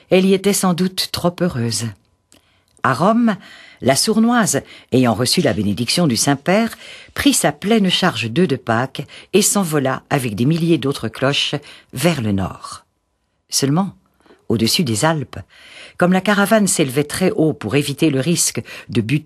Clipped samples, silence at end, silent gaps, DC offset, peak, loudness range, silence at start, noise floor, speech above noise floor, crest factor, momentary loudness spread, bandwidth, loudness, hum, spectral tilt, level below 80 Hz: under 0.1%; 0 s; none; under 0.1%; 0 dBFS; 4 LU; 0.1 s; -68 dBFS; 51 dB; 18 dB; 10 LU; 13 kHz; -17 LUFS; none; -4.5 dB/octave; -52 dBFS